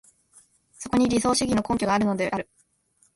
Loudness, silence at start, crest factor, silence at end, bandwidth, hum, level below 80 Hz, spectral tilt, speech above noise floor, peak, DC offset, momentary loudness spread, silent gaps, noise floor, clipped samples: -24 LUFS; 0.8 s; 16 dB; 0.7 s; 11.5 kHz; none; -50 dBFS; -4.5 dB/octave; 43 dB; -10 dBFS; under 0.1%; 12 LU; none; -66 dBFS; under 0.1%